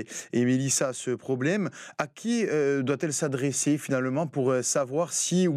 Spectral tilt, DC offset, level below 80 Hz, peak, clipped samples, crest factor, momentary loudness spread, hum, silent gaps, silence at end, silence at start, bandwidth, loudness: -4.5 dB/octave; under 0.1%; -80 dBFS; -12 dBFS; under 0.1%; 16 dB; 6 LU; none; none; 0 s; 0 s; 14.5 kHz; -27 LUFS